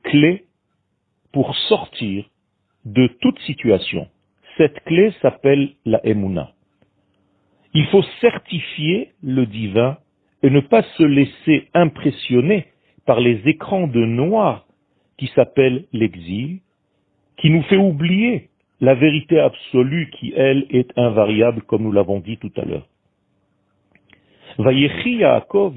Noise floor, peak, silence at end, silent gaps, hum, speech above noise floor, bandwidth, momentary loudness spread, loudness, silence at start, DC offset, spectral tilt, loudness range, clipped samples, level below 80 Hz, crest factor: -69 dBFS; 0 dBFS; 0 s; none; none; 53 dB; 4.6 kHz; 11 LU; -17 LUFS; 0.05 s; under 0.1%; -11 dB/octave; 4 LU; under 0.1%; -54 dBFS; 18 dB